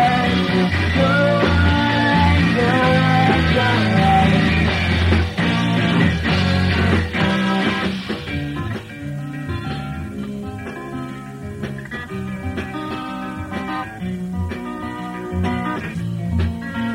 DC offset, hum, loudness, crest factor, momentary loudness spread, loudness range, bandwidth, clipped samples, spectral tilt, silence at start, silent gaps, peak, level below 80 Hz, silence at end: under 0.1%; none; -19 LUFS; 16 dB; 14 LU; 13 LU; 12 kHz; under 0.1%; -6.5 dB/octave; 0 s; none; -2 dBFS; -32 dBFS; 0 s